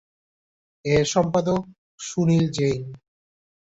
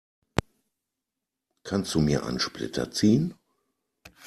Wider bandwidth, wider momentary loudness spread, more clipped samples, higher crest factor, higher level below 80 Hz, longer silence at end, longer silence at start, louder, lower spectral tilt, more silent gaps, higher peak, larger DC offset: second, 8 kHz vs 13.5 kHz; first, 13 LU vs 10 LU; neither; second, 16 dB vs 28 dB; about the same, -50 dBFS vs -50 dBFS; second, 0.75 s vs 0.95 s; first, 0.85 s vs 0.35 s; first, -22 LUFS vs -27 LUFS; about the same, -6 dB/octave vs -5.5 dB/octave; first, 1.78-1.98 s vs none; second, -8 dBFS vs 0 dBFS; neither